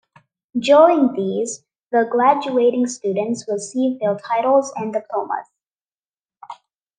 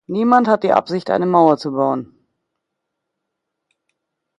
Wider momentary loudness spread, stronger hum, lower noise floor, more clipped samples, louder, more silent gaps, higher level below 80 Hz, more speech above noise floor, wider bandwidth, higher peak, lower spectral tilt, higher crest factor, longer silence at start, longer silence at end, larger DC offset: first, 14 LU vs 7 LU; neither; first, under -90 dBFS vs -78 dBFS; neither; second, -19 LUFS vs -16 LUFS; first, 1.83-1.91 s, 5.81-5.85 s, 5.94-6.03 s vs none; second, -74 dBFS vs -66 dBFS; first, over 72 dB vs 63 dB; about the same, 9.8 kHz vs 9.2 kHz; about the same, -2 dBFS vs 0 dBFS; second, -5 dB/octave vs -7.5 dB/octave; about the same, 18 dB vs 18 dB; first, 0.55 s vs 0.1 s; second, 0.45 s vs 2.35 s; neither